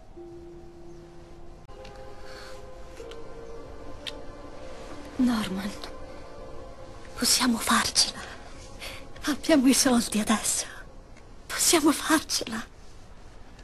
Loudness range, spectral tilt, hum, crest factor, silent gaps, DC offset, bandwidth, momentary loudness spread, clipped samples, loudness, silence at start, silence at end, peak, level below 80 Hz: 20 LU; -2 dB/octave; none; 22 dB; none; under 0.1%; 13 kHz; 24 LU; under 0.1%; -24 LUFS; 0 s; 0 s; -6 dBFS; -48 dBFS